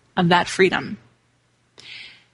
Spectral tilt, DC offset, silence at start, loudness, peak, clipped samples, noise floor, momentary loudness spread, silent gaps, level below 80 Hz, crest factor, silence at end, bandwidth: -5 dB/octave; under 0.1%; 0.15 s; -19 LUFS; -2 dBFS; under 0.1%; -63 dBFS; 21 LU; none; -58 dBFS; 20 dB; 0.25 s; 11.5 kHz